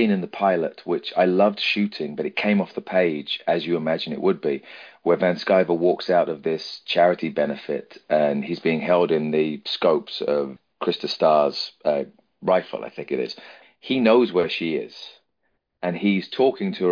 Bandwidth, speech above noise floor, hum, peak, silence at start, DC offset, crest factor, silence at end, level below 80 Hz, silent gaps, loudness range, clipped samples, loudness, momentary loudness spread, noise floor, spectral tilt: 5.2 kHz; 52 dB; none; -4 dBFS; 0 s; under 0.1%; 18 dB; 0 s; -70 dBFS; none; 2 LU; under 0.1%; -22 LUFS; 10 LU; -74 dBFS; -7 dB/octave